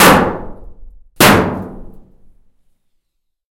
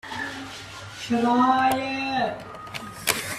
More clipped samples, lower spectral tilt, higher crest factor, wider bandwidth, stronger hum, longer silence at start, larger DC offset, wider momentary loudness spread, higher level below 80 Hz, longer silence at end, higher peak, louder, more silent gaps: first, 0.3% vs under 0.1%; about the same, -4 dB/octave vs -3.5 dB/octave; second, 16 dB vs 22 dB; first, over 20 kHz vs 16 kHz; neither; about the same, 0 s vs 0.05 s; neither; first, 22 LU vs 17 LU; first, -34 dBFS vs -58 dBFS; first, 1.55 s vs 0 s; first, 0 dBFS vs -4 dBFS; first, -11 LUFS vs -24 LUFS; neither